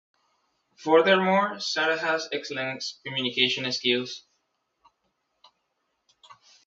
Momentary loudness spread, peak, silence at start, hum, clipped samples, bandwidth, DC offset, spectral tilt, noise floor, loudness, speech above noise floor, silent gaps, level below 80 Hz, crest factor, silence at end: 12 LU; -6 dBFS; 0.8 s; none; under 0.1%; 7.8 kHz; under 0.1%; -3.5 dB/octave; -77 dBFS; -24 LUFS; 52 dB; none; -76 dBFS; 22 dB; 0.35 s